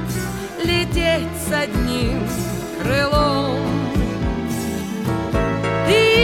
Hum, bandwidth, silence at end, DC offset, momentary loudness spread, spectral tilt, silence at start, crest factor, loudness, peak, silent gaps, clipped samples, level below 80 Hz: none; 17 kHz; 0 s; 0.1%; 8 LU; -5 dB/octave; 0 s; 16 dB; -20 LUFS; -2 dBFS; none; under 0.1%; -30 dBFS